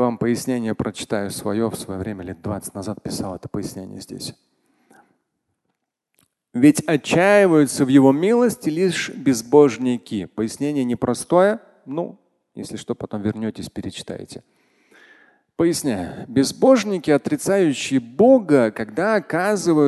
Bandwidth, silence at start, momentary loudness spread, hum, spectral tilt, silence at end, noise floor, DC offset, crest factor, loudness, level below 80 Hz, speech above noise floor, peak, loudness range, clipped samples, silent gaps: 12.5 kHz; 0 s; 17 LU; none; -5.5 dB/octave; 0 s; -76 dBFS; under 0.1%; 20 dB; -19 LUFS; -52 dBFS; 57 dB; 0 dBFS; 14 LU; under 0.1%; none